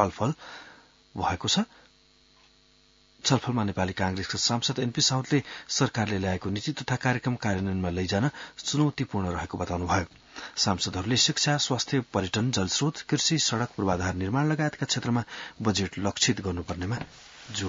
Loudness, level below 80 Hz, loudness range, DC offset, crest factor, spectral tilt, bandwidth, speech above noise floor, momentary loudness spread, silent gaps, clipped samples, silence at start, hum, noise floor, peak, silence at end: -27 LUFS; -58 dBFS; 4 LU; under 0.1%; 22 dB; -4 dB/octave; 7.8 kHz; 33 dB; 9 LU; none; under 0.1%; 0 s; none; -61 dBFS; -6 dBFS; 0 s